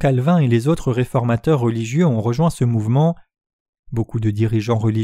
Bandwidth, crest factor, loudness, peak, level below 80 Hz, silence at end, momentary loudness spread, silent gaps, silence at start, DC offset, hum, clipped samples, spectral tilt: 13 kHz; 14 dB; -18 LUFS; -4 dBFS; -42 dBFS; 0 s; 6 LU; 3.53-3.73 s, 3.79-3.83 s; 0 s; under 0.1%; none; under 0.1%; -8 dB/octave